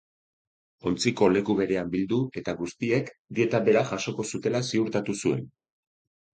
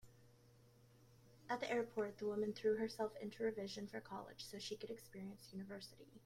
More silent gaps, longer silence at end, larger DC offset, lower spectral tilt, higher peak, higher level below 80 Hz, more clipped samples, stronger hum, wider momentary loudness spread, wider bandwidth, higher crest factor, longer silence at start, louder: first, 3.19-3.25 s vs none; first, 0.85 s vs 0.05 s; neither; about the same, -5.5 dB/octave vs -5 dB/octave; first, -8 dBFS vs -28 dBFS; first, -60 dBFS vs -78 dBFS; neither; neither; second, 10 LU vs 13 LU; second, 9.6 kHz vs 16 kHz; about the same, 20 dB vs 18 dB; first, 0.85 s vs 0.05 s; first, -27 LUFS vs -45 LUFS